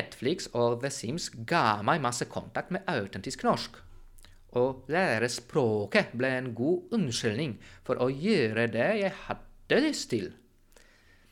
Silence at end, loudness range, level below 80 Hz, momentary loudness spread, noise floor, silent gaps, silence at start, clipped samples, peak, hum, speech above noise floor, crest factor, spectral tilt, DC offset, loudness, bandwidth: 1 s; 2 LU; -58 dBFS; 9 LU; -59 dBFS; none; 0 s; under 0.1%; -10 dBFS; none; 30 dB; 20 dB; -5 dB/octave; under 0.1%; -29 LUFS; 16.5 kHz